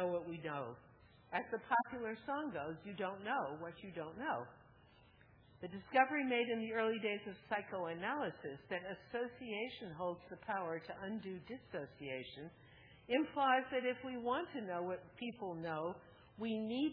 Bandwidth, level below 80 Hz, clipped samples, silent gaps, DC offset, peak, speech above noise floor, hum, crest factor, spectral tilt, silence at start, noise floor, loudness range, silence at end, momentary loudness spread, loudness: 4.8 kHz; -76 dBFS; under 0.1%; none; under 0.1%; -16 dBFS; 25 dB; none; 26 dB; -3 dB/octave; 0 s; -66 dBFS; 6 LU; 0 s; 14 LU; -41 LUFS